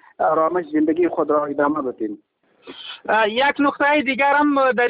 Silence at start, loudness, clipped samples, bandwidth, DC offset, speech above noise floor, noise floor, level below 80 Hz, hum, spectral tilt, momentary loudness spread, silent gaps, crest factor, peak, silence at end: 0.2 s; -19 LUFS; under 0.1%; 5 kHz; under 0.1%; 24 dB; -42 dBFS; -62 dBFS; none; -9 dB/octave; 13 LU; none; 14 dB; -6 dBFS; 0 s